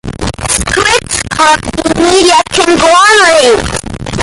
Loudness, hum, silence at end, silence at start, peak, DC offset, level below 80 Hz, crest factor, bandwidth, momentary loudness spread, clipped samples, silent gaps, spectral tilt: -7 LUFS; none; 0 s; 0.05 s; 0 dBFS; under 0.1%; -28 dBFS; 8 dB; 16 kHz; 13 LU; 0.2%; none; -2.5 dB/octave